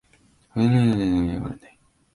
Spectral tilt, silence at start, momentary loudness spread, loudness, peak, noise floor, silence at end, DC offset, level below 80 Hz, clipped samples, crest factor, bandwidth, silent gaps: -8.5 dB/octave; 0.55 s; 15 LU; -22 LUFS; -8 dBFS; -59 dBFS; 0.6 s; under 0.1%; -44 dBFS; under 0.1%; 14 dB; 11 kHz; none